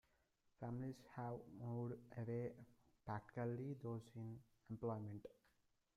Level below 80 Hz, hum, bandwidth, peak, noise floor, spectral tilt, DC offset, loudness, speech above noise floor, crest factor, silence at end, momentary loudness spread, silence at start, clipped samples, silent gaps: -78 dBFS; none; 11.5 kHz; -34 dBFS; -82 dBFS; -9 dB/octave; under 0.1%; -51 LUFS; 33 dB; 16 dB; 0.65 s; 11 LU; 0.6 s; under 0.1%; none